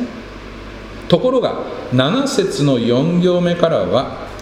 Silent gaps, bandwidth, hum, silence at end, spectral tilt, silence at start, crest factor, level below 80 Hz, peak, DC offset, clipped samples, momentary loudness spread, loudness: none; 14.5 kHz; none; 0 s; -6 dB/octave; 0 s; 16 dB; -42 dBFS; 0 dBFS; under 0.1%; under 0.1%; 18 LU; -16 LUFS